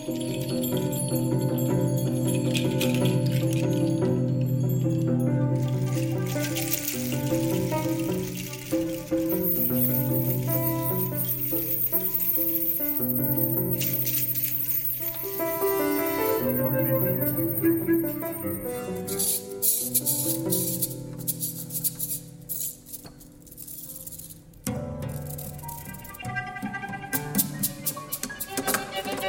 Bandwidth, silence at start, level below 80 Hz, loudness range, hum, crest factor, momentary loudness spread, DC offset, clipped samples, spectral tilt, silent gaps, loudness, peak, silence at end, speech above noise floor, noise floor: 17 kHz; 0 s; -54 dBFS; 9 LU; none; 20 dB; 11 LU; under 0.1%; under 0.1%; -5 dB/octave; none; -25 LUFS; -6 dBFS; 0 s; 20 dB; -47 dBFS